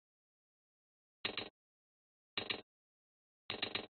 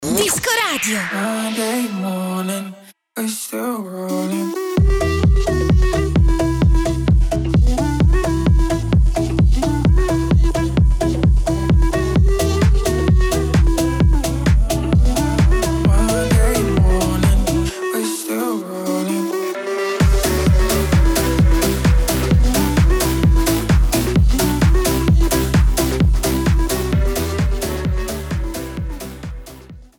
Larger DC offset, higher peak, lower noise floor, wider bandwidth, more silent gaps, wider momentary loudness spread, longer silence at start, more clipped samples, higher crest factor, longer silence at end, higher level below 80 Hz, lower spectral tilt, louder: neither; second, -22 dBFS vs -4 dBFS; first, under -90 dBFS vs -38 dBFS; second, 4.5 kHz vs 20 kHz; first, 1.50-2.37 s, 2.63-3.49 s vs none; about the same, 6 LU vs 7 LU; first, 1.25 s vs 0 s; neither; first, 26 dB vs 10 dB; about the same, 0.1 s vs 0.15 s; second, -76 dBFS vs -18 dBFS; second, 0 dB/octave vs -5.5 dB/octave; second, -43 LUFS vs -17 LUFS